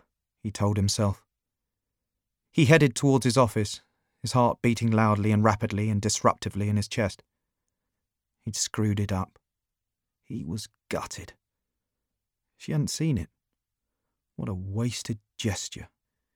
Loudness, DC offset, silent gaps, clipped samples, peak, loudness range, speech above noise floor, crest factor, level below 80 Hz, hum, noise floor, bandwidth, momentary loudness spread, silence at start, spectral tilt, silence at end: -26 LUFS; under 0.1%; none; under 0.1%; -6 dBFS; 11 LU; 61 dB; 22 dB; -56 dBFS; none; -86 dBFS; 16 kHz; 16 LU; 0.45 s; -5.5 dB/octave; 0.5 s